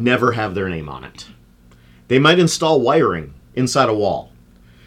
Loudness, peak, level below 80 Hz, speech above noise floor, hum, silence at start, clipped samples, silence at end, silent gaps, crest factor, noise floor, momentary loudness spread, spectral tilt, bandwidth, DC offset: -17 LUFS; -2 dBFS; -48 dBFS; 32 dB; none; 0 s; under 0.1%; 0.65 s; none; 16 dB; -48 dBFS; 16 LU; -5 dB/octave; 15.5 kHz; under 0.1%